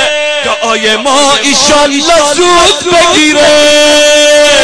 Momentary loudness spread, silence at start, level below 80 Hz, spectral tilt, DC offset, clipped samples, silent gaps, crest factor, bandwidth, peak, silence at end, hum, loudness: 5 LU; 0 s; -34 dBFS; -1 dB/octave; under 0.1%; 0.3%; none; 6 dB; 11 kHz; 0 dBFS; 0 s; none; -5 LUFS